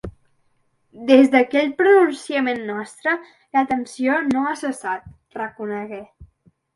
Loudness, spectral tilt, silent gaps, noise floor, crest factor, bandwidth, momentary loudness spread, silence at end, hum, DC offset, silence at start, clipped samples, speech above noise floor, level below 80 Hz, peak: -19 LUFS; -5 dB/octave; none; -65 dBFS; 20 dB; 11.5 kHz; 16 LU; 0.5 s; none; under 0.1%; 0.05 s; under 0.1%; 46 dB; -54 dBFS; 0 dBFS